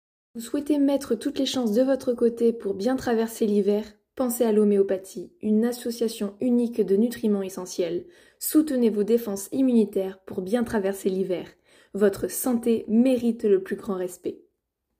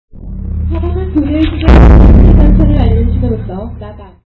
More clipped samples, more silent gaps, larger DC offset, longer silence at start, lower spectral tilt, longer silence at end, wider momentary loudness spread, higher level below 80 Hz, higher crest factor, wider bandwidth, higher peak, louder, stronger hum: neither; neither; neither; first, 0.35 s vs 0.15 s; second, -5.5 dB/octave vs -10 dB/octave; first, 0.65 s vs 0.2 s; second, 11 LU vs 20 LU; second, -62 dBFS vs -10 dBFS; first, 16 dB vs 6 dB; first, 16 kHz vs 5 kHz; second, -8 dBFS vs -2 dBFS; second, -25 LUFS vs -9 LUFS; neither